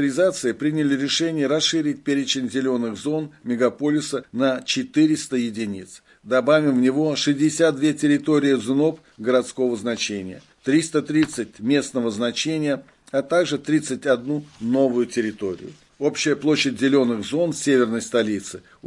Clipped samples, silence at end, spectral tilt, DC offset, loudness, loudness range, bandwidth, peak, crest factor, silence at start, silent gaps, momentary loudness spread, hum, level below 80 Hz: under 0.1%; 0 s; -4.5 dB/octave; under 0.1%; -22 LUFS; 3 LU; 11.5 kHz; -6 dBFS; 16 dB; 0 s; none; 9 LU; none; -66 dBFS